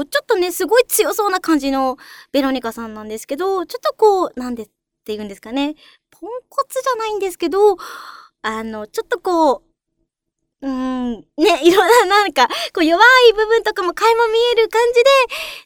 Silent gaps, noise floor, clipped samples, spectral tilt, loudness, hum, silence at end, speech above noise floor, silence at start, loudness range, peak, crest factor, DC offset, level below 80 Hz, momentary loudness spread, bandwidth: none; -77 dBFS; under 0.1%; -2 dB/octave; -16 LUFS; none; 0.05 s; 60 dB; 0 s; 9 LU; 0 dBFS; 16 dB; under 0.1%; -52 dBFS; 16 LU; over 20 kHz